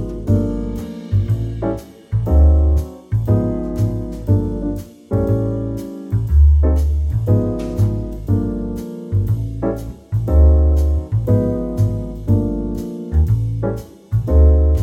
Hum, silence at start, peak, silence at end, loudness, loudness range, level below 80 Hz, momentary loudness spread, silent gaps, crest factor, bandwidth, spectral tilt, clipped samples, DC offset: none; 0 s; -2 dBFS; 0 s; -18 LUFS; 3 LU; -18 dBFS; 12 LU; none; 14 dB; 6.6 kHz; -10 dB/octave; under 0.1%; under 0.1%